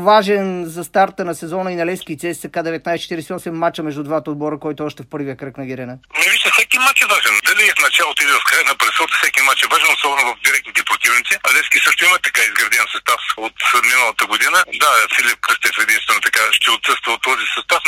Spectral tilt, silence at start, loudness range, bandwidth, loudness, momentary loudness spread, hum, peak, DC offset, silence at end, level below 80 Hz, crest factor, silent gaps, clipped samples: -1.5 dB/octave; 0 s; 10 LU; 16.5 kHz; -14 LUFS; 13 LU; none; 0 dBFS; under 0.1%; 0 s; -58 dBFS; 16 dB; none; under 0.1%